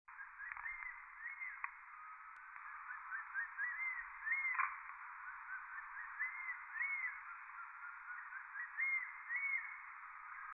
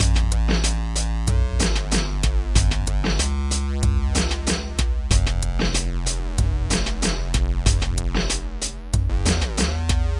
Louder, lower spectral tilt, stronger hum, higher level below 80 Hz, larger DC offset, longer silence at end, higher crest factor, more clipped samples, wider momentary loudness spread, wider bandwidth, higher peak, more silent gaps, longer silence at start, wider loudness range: second, -44 LUFS vs -23 LUFS; second, 12 dB/octave vs -4 dB/octave; neither; second, -80 dBFS vs -22 dBFS; neither; about the same, 0 s vs 0 s; about the same, 22 dB vs 18 dB; neither; first, 13 LU vs 4 LU; second, 3.8 kHz vs 11.5 kHz; second, -24 dBFS vs -2 dBFS; neither; about the same, 0.1 s vs 0 s; first, 4 LU vs 1 LU